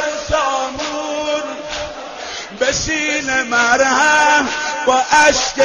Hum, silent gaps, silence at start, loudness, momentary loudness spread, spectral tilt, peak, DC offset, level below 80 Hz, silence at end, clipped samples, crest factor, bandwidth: none; none; 0 s; -15 LUFS; 14 LU; -1.5 dB/octave; -2 dBFS; under 0.1%; -42 dBFS; 0 s; under 0.1%; 14 dB; 10.5 kHz